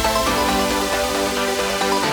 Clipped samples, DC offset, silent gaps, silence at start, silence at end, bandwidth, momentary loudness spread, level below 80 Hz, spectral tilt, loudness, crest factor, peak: under 0.1%; under 0.1%; none; 0 s; 0 s; over 20 kHz; 2 LU; -36 dBFS; -2.5 dB/octave; -19 LUFS; 14 dB; -6 dBFS